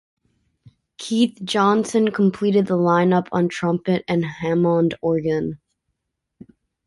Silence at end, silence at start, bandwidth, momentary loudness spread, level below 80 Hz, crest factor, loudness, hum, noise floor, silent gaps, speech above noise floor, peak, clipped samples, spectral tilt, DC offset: 1.3 s; 1 s; 11.5 kHz; 6 LU; -58 dBFS; 16 dB; -20 LUFS; none; -78 dBFS; none; 58 dB; -6 dBFS; under 0.1%; -6.5 dB/octave; under 0.1%